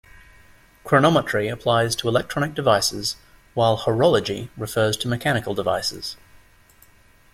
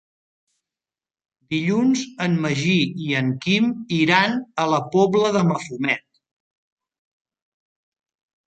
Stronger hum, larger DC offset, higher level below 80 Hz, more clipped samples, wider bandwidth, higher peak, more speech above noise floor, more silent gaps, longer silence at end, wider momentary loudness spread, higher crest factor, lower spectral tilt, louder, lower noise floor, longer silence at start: neither; neither; first, -50 dBFS vs -64 dBFS; neither; first, 16.5 kHz vs 9 kHz; about the same, -2 dBFS vs -2 dBFS; second, 33 dB vs over 70 dB; neither; second, 1.2 s vs 2.5 s; first, 11 LU vs 6 LU; about the same, 20 dB vs 22 dB; about the same, -4.5 dB/octave vs -5.5 dB/octave; about the same, -21 LUFS vs -20 LUFS; second, -53 dBFS vs under -90 dBFS; second, 0.85 s vs 1.5 s